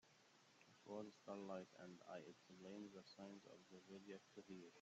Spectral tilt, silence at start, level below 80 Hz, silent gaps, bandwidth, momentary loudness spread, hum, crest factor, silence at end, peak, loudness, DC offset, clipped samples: -5 dB/octave; 0.05 s; under -90 dBFS; none; 8 kHz; 9 LU; none; 20 dB; 0 s; -40 dBFS; -59 LUFS; under 0.1%; under 0.1%